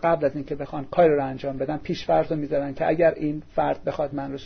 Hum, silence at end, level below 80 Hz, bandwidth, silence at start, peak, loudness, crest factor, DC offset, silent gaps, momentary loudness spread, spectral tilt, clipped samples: none; 0 s; -48 dBFS; 6.4 kHz; 0 s; -8 dBFS; -24 LUFS; 16 dB; under 0.1%; none; 9 LU; -8 dB/octave; under 0.1%